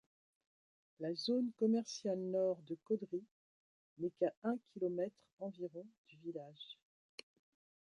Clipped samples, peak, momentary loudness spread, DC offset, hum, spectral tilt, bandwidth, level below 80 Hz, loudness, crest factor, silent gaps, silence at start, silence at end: under 0.1%; -22 dBFS; 19 LU; under 0.1%; none; -6 dB/octave; 11 kHz; under -90 dBFS; -41 LUFS; 20 dB; 3.31-3.96 s, 4.37-4.42 s, 5.33-5.37 s, 5.98-6.04 s; 1 s; 1.15 s